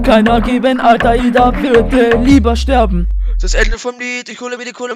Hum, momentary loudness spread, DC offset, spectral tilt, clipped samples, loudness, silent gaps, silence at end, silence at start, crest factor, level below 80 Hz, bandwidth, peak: none; 12 LU; under 0.1%; -5.5 dB/octave; 0.1%; -12 LUFS; none; 0 s; 0 s; 12 dB; -18 dBFS; 13 kHz; 0 dBFS